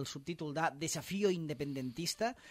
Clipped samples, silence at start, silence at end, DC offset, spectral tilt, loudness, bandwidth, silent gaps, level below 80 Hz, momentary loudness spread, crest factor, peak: under 0.1%; 0 s; 0 s; under 0.1%; -4 dB/octave; -37 LUFS; 16 kHz; none; -70 dBFS; 6 LU; 18 dB; -20 dBFS